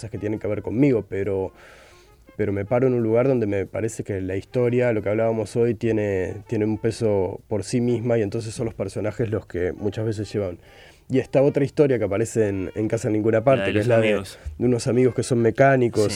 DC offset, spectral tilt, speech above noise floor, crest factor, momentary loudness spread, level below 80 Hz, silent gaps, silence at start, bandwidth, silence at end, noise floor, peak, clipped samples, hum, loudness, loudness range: under 0.1%; -7 dB/octave; 28 dB; 18 dB; 9 LU; -50 dBFS; none; 0 s; 13.5 kHz; 0 s; -50 dBFS; -4 dBFS; under 0.1%; none; -22 LUFS; 5 LU